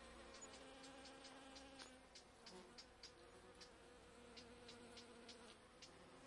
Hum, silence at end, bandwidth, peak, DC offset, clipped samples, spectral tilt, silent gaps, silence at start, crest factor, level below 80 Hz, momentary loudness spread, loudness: none; 0 s; 12 kHz; -40 dBFS; under 0.1%; under 0.1%; -2.5 dB/octave; none; 0 s; 22 dB; -76 dBFS; 5 LU; -61 LUFS